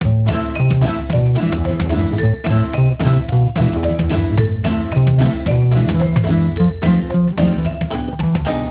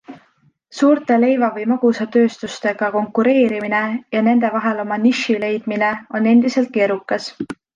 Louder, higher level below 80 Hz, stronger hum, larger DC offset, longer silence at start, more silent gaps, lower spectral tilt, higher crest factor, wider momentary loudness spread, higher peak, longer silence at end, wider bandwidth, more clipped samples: about the same, -17 LUFS vs -17 LUFS; first, -28 dBFS vs -66 dBFS; neither; neither; about the same, 0 s vs 0.1 s; neither; first, -12.5 dB/octave vs -5.5 dB/octave; about the same, 12 dB vs 14 dB; second, 4 LU vs 8 LU; about the same, -2 dBFS vs -4 dBFS; second, 0 s vs 0.2 s; second, 4 kHz vs 7.6 kHz; neither